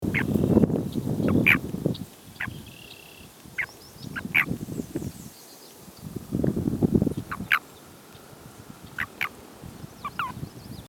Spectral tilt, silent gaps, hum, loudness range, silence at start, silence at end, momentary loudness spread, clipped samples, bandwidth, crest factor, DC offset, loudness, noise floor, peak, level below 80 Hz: -6 dB/octave; none; none; 6 LU; 0 s; 0 s; 24 LU; under 0.1%; 19.5 kHz; 24 dB; under 0.1%; -26 LUFS; -48 dBFS; -6 dBFS; -48 dBFS